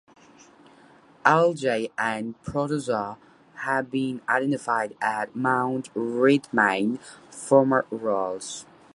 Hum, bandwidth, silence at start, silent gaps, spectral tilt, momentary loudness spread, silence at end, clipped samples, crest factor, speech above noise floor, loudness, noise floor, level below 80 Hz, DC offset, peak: none; 11.5 kHz; 1.25 s; none; -5.5 dB/octave; 13 LU; 0.3 s; under 0.1%; 24 dB; 29 dB; -24 LUFS; -54 dBFS; -64 dBFS; under 0.1%; -2 dBFS